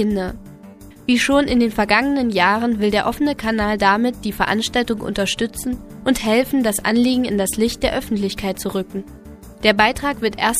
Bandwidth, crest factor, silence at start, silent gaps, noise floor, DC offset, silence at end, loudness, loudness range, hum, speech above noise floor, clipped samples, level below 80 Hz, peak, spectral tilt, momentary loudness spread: 15.5 kHz; 18 dB; 0 s; none; -40 dBFS; under 0.1%; 0 s; -18 LUFS; 3 LU; none; 22 dB; under 0.1%; -40 dBFS; 0 dBFS; -4 dB/octave; 9 LU